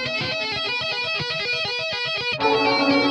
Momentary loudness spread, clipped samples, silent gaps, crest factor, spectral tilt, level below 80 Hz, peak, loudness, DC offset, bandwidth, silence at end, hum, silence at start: 5 LU; under 0.1%; none; 16 dB; -4 dB/octave; -58 dBFS; -6 dBFS; -21 LUFS; under 0.1%; 10.5 kHz; 0 s; none; 0 s